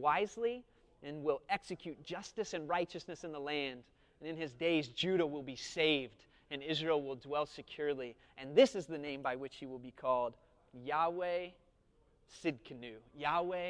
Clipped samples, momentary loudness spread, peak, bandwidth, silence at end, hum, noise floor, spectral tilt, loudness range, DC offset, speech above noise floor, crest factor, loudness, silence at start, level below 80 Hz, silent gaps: under 0.1%; 16 LU; -16 dBFS; 10.5 kHz; 0 s; none; -71 dBFS; -4.5 dB/octave; 4 LU; under 0.1%; 33 dB; 22 dB; -37 LUFS; 0 s; -70 dBFS; none